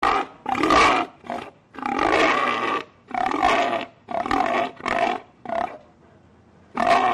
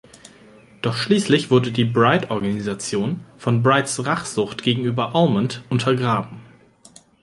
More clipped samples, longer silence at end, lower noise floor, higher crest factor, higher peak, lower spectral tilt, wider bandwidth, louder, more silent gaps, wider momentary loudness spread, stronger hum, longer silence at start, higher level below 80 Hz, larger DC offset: neither; second, 0 s vs 0.8 s; about the same, -53 dBFS vs -50 dBFS; about the same, 16 dB vs 20 dB; second, -8 dBFS vs -2 dBFS; second, -3.5 dB/octave vs -5.5 dB/octave; about the same, 12.5 kHz vs 11.5 kHz; about the same, -22 LUFS vs -20 LUFS; neither; first, 14 LU vs 8 LU; neither; second, 0 s vs 0.85 s; first, -50 dBFS vs -56 dBFS; neither